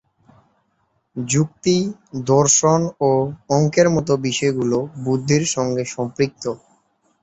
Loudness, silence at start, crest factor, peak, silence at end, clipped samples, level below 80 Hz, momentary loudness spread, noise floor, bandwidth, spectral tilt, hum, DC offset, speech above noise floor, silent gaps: -19 LUFS; 1.15 s; 18 dB; -2 dBFS; 0.65 s; under 0.1%; -54 dBFS; 13 LU; -67 dBFS; 8.2 kHz; -4.5 dB/octave; none; under 0.1%; 48 dB; none